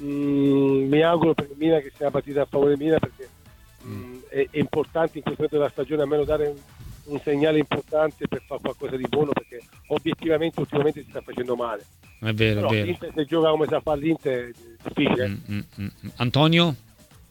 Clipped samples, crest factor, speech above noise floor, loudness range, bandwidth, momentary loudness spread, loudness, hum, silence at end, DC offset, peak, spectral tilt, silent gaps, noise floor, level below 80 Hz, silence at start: under 0.1%; 20 dB; 27 dB; 4 LU; 18 kHz; 15 LU; -24 LUFS; none; 0.55 s; under 0.1%; -4 dBFS; -7 dB/octave; none; -51 dBFS; -50 dBFS; 0 s